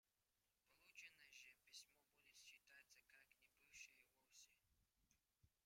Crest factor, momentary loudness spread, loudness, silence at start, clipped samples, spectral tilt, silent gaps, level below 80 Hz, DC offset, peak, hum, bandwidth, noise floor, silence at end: 22 dB; 6 LU; -66 LUFS; 0.05 s; under 0.1%; 1 dB/octave; none; under -90 dBFS; under 0.1%; -50 dBFS; 50 Hz at -100 dBFS; 16 kHz; under -90 dBFS; 0 s